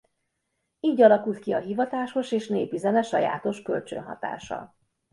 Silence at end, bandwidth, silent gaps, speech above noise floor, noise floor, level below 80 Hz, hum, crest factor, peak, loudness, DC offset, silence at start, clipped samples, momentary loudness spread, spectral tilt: 0.45 s; 11.5 kHz; none; 54 dB; -78 dBFS; -68 dBFS; none; 22 dB; -4 dBFS; -25 LUFS; under 0.1%; 0.85 s; under 0.1%; 16 LU; -6 dB/octave